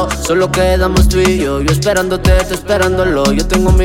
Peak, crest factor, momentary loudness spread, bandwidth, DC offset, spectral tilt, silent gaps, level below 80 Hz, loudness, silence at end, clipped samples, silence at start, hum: 0 dBFS; 10 dB; 3 LU; 17 kHz; under 0.1%; -5 dB/octave; none; -18 dBFS; -12 LUFS; 0 s; under 0.1%; 0 s; none